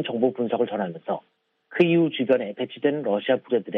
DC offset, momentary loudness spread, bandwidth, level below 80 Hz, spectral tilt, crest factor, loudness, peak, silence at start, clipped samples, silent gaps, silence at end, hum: under 0.1%; 11 LU; 5 kHz; -74 dBFS; -9 dB/octave; 18 dB; -24 LUFS; -6 dBFS; 0 s; under 0.1%; none; 0 s; none